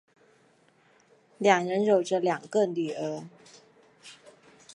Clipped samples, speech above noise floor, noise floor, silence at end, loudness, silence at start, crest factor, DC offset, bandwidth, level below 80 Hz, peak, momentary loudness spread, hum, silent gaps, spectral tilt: under 0.1%; 37 dB; -63 dBFS; 0.6 s; -26 LUFS; 1.4 s; 24 dB; under 0.1%; 11 kHz; -82 dBFS; -4 dBFS; 25 LU; none; none; -5 dB/octave